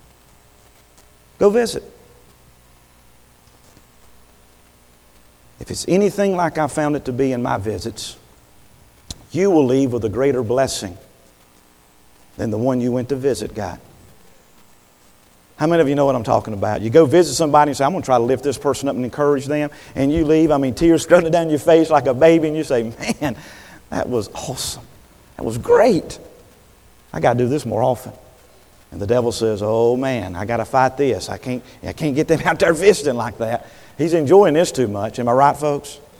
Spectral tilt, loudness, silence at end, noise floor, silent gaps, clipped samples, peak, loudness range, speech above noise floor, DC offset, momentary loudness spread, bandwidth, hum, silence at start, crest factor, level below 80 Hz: -5.5 dB/octave; -18 LUFS; 0.2 s; -52 dBFS; none; under 0.1%; 0 dBFS; 8 LU; 35 dB; under 0.1%; 14 LU; 19.5 kHz; none; 1.4 s; 18 dB; -46 dBFS